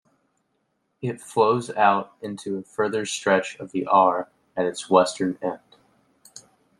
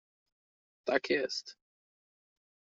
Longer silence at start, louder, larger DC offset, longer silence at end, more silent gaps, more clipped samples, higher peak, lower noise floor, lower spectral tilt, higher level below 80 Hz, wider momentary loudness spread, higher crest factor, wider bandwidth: first, 1 s vs 0.85 s; first, -23 LUFS vs -33 LUFS; neither; second, 0.4 s vs 1.25 s; neither; neither; first, -2 dBFS vs -12 dBFS; second, -72 dBFS vs under -90 dBFS; first, -4.5 dB/octave vs -1 dB/octave; first, -70 dBFS vs -82 dBFS; about the same, 13 LU vs 12 LU; about the same, 22 dB vs 26 dB; first, 12.5 kHz vs 7.6 kHz